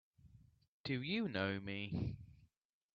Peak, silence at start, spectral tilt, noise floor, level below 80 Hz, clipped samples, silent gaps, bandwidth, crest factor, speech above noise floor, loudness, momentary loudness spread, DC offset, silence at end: -22 dBFS; 0.25 s; -4.5 dB/octave; -66 dBFS; -66 dBFS; under 0.1%; 0.68-0.84 s; 7.2 kHz; 22 dB; 26 dB; -42 LUFS; 13 LU; under 0.1%; 0.5 s